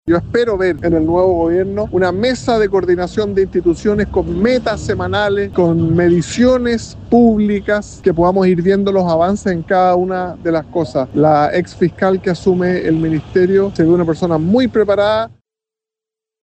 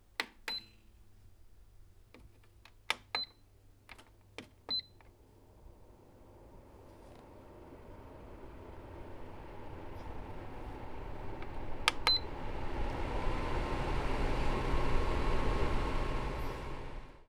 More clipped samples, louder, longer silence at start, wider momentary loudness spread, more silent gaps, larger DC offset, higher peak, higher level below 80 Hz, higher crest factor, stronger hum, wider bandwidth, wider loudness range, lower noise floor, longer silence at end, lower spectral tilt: neither; first, -14 LUFS vs -38 LUFS; second, 0.05 s vs 0.2 s; second, 5 LU vs 21 LU; neither; neither; first, -2 dBFS vs -8 dBFS; about the same, -36 dBFS vs -40 dBFS; second, 12 dB vs 30 dB; neither; second, 8.8 kHz vs 13.5 kHz; second, 2 LU vs 18 LU; first, -87 dBFS vs -61 dBFS; first, 1.15 s vs 0.05 s; first, -7 dB/octave vs -4.5 dB/octave